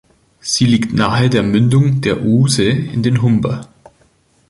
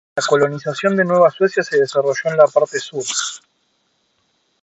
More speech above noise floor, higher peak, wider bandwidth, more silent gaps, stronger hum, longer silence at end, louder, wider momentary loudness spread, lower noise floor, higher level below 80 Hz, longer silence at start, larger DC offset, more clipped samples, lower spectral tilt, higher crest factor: second, 41 dB vs 49 dB; about the same, 0 dBFS vs 0 dBFS; first, 11.5 kHz vs 8.2 kHz; neither; neither; second, 0.85 s vs 1.25 s; first, -14 LUFS vs -17 LUFS; about the same, 6 LU vs 8 LU; second, -54 dBFS vs -65 dBFS; first, -42 dBFS vs -68 dBFS; first, 0.45 s vs 0.15 s; neither; neither; first, -5.5 dB/octave vs -4 dB/octave; about the same, 14 dB vs 18 dB